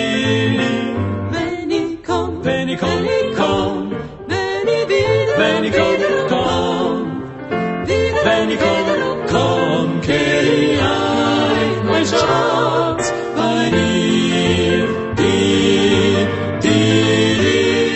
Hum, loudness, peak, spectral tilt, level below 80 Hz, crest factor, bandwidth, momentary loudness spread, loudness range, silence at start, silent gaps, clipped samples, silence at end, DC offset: none; -16 LUFS; 0 dBFS; -5 dB/octave; -42 dBFS; 16 dB; 8.4 kHz; 7 LU; 4 LU; 0 s; none; under 0.1%; 0 s; under 0.1%